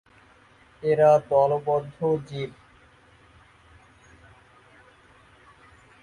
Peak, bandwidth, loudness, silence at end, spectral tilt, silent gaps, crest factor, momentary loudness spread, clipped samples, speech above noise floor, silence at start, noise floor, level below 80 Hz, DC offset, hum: -6 dBFS; 10.5 kHz; -23 LUFS; 3.5 s; -7.5 dB/octave; none; 20 dB; 16 LU; under 0.1%; 34 dB; 0.85 s; -56 dBFS; -62 dBFS; under 0.1%; none